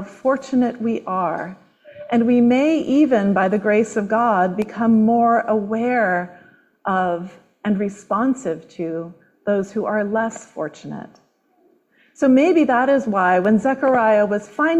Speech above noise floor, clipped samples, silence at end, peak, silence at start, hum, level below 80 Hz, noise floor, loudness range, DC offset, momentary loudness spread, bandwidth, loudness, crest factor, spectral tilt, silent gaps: 42 dB; under 0.1%; 0 s; -4 dBFS; 0 s; none; -62 dBFS; -60 dBFS; 7 LU; under 0.1%; 14 LU; 8.4 kHz; -19 LUFS; 14 dB; -7 dB/octave; none